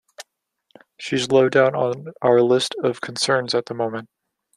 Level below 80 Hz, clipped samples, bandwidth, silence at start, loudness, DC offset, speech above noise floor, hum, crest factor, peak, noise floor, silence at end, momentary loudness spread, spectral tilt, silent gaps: -66 dBFS; under 0.1%; 12.5 kHz; 0.2 s; -20 LUFS; under 0.1%; 49 dB; none; 18 dB; -4 dBFS; -69 dBFS; 0.55 s; 10 LU; -4.5 dB/octave; none